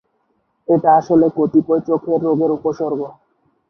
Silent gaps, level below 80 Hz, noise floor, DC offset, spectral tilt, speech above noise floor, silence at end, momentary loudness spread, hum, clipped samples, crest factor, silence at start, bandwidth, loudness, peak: none; -60 dBFS; -66 dBFS; under 0.1%; -9.5 dB/octave; 50 dB; 0.6 s; 11 LU; none; under 0.1%; 14 dB; 0.7 s; 6.4 kHz; -16 LUFS; -2 dBFS